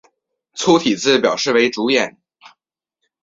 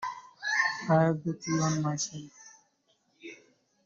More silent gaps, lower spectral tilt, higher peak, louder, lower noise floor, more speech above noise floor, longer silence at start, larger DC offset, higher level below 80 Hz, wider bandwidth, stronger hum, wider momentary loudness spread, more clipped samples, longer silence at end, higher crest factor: neither; second, -3.5 dB/octave vs -5 dB/octave; first, -2 dBFS vs -12 dBFS; first, -16 LUFS vs -29 LUFS; first, -78 dBFS vs -72 dBFS; first, 62 dB vs 44 dB; first, 0.55 s vs 0 s; neither; first, -62 dBFS vs -70 dBFS; about the same, 8 kHz vs 7.8 kHz; neither; second, 7 LU vs 23 LU; neither; first, 1.15 s vs 0.5 s; about the same, 18 dB vs 20 dB